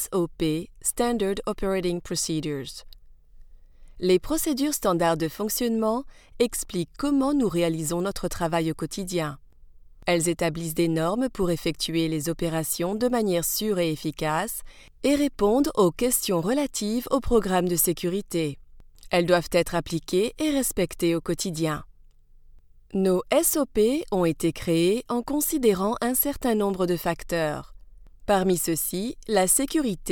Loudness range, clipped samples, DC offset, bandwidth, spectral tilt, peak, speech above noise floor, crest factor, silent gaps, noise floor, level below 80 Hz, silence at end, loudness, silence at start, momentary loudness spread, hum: 4 LU; under 0.1%; under 0.1%; 19 kHz; -4.5 dB/octave; -8 dBFS; 27 dB; 18 dB; none; -52 dBFS; -44 dBFS; 0 s; -25 LUFS; 0 s; 7 LU; none